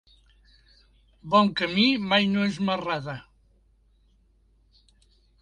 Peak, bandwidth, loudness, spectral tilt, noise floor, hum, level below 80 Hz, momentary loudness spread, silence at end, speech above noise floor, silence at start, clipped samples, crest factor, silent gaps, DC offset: -6 dBFS; 9.8 kHz; -23 LUFS; -6 dB/octave; -62 dBFS; none; -60 dBFS; 15 LU; 2.2 s; 39 dB; 1.25 s; under 0.1%; 22 dB; none; under 0.1%